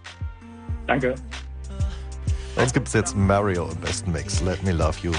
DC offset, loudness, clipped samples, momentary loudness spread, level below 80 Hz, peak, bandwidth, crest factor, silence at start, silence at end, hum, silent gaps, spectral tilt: under 0.1%; -24 LUFS; under 0.1%; 15 LU; -34 dBFS; -6 dBFS; 10 kHz; 18 dB; 0 s; 0 s; none; none; -5.5 dB/octave